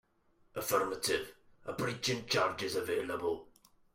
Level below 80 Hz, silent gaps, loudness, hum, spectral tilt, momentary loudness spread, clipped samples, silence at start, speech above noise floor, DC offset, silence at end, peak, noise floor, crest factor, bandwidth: -68 dBFS; none; -35 LUFS; none; -3 dB/octave; 12 LU; under 0.1%; 0.55 s; 36 dB; under 0.1%; 0.5 s; -16 dBFS; -70 dBFS; 20 dB; 16.5 kHz